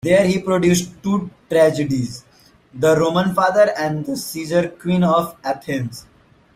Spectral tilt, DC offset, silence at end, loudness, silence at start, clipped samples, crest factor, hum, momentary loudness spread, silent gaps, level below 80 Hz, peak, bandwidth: -5.5 dB/octave; under 0.1%; 0.55 s; -18 LUFS; 0.05 s; under 0.1%; 16 dB; none; 10 LU; none; -52 dBFS; -2 dBFS; 15.5 kHz